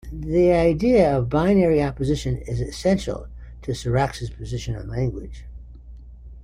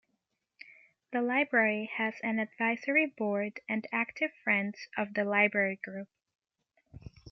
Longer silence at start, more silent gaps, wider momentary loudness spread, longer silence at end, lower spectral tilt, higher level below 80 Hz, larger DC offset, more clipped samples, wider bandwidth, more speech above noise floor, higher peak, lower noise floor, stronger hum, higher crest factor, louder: second, 0.05 s vs 0.7 s; neither; first, 18 LU vs 11 LU; about the same, 0 s vs 0 s; about the same, -7 dB/octave vs -6.5 dB/octave; first, -36 dBFS vs -70 dBFS; neither; neither; first, 15 kHz vs 6.4 kHz; second, 20 dB vs 50 dB; first, -6 dBFS vs -12 dBFS; second, -41 dBFS vs -81 dBFS; neither; second, 16 dB vs 22 dB; first, -22 LUFS vs -30 LUFS